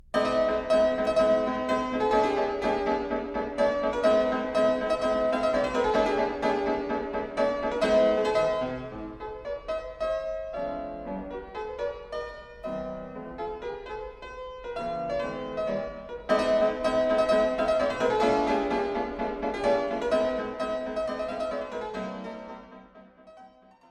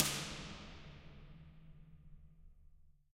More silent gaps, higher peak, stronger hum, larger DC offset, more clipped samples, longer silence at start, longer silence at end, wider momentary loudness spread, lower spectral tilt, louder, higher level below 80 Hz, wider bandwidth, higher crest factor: neither; about the same, -10 dBFS vs -8 dBFS; neither; neither; neither; first, 0.15 s vs 0 s; first, 0.45 s vs 0.2 s; second, 13 LU vs 22 LU; first, -5.5 dB/octave vs -2.5 dB/octave; first, -27 LUFS vs -44 LUFS; first, -50 dBFS vs -60 dBFS; second, 10.5 kHz vs 16 kHz; second, 16 dB vs 40 dB